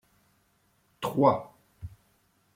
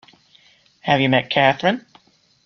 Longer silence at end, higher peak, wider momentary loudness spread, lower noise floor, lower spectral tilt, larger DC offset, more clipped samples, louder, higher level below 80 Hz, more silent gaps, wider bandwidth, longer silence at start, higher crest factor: about the same, 0.7 s vs 0.65 s; second, -8 dBFS vs -2 dBFS; first, 23 LU vs 11 LU; first, -69 dBFS vs -55 dBFS; about the same, -7.5 dB/octave vs -6.5 dB/octave; neither; neither; second, -27 LUFS vs -18 LUFS; about the same, -60 dBFS vs -60 dBFS; neither; first, 16.5 kHz vs 6.8 kHz; first, 1 s vs 0.85 s; about the same, 22 dB vs 20 dB